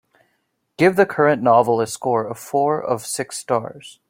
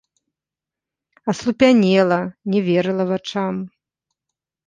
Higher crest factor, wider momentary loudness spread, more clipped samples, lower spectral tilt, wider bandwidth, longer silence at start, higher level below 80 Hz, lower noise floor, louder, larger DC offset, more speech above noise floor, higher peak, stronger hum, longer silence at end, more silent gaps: about the same, 18 dB vs 18 dB; second, 8 LU vs 13 LU; neither; second, -5 dB/octave vs -6.5 dB/octave; first, 16.5 kHz vs 9.4 kHz; second, 0.8 s vs 1.25 s; about the same, -62 dBFS vs -60 dBFS; second, -70 dBFS vs -88 dBFS; about the same, -19 LUFS vs -18 LUFS; neither; second, 51 dB vs 70 dB; about the same, -2 dBFS vs -2 dBFS; neither; second, 0.2 s vs 1 s; neither